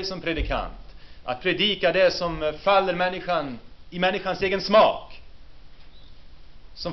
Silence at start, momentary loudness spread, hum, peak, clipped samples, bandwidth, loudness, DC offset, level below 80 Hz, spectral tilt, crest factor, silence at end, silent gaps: 0 s; 16 LU; none; -6 dBFS; under 0.1%; 6.4 kHz; -23 LUFS; under 0.1%; -42 dBFS; -2 dB/octave; 18 dB; 0 s; none